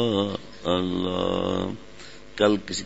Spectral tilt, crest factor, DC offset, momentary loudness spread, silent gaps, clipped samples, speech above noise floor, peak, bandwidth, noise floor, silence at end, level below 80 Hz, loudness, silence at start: -5 dB/octave; 20 dB; 0.6%; 17 LU; none; under 0.1%; 21 dB; -6 dBFS; 8 kHz; -45 dBFS; 0 s; -52 dBFS; -26 LUFS; 0 s